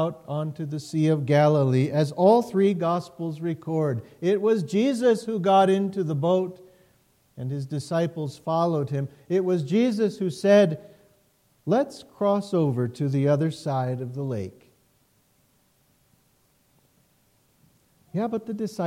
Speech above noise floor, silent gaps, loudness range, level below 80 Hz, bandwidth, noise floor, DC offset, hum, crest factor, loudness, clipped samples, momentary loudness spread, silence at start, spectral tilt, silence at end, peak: 42 dB; none; 11 LU; -70 dBFS; 14.5 kHz; -65 dBFS; under 0.1%; none; 18 dB; -24 LUFS; under 0.1%; 12 LU; 0 s; -7.5 dB/octave; 0 s; -8 dBFS